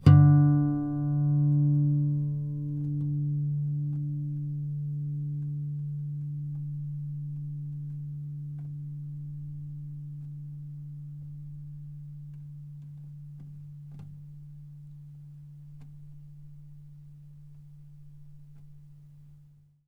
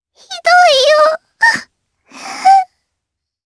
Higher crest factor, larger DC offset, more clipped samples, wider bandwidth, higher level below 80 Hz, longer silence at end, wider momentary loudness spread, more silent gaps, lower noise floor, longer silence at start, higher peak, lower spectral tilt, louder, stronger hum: first, 24 dB vs 14 dB; neither; neither; second, 5 kHz vs 11 kHz; about the same, -58 dBFS vs -60 dBFS; second, 0.45 s vs 0.9 s; first, 25 LU vs 20 LU; neither; second, -57 dBFS vs -78 dBFS; second, 0 s vs 0.3 s; second, -6 dBFS vs 0 dBFS; first, -11 dB/octave vs 0 dB/octave; second, -29 LUFS vs -11 LUFS; neither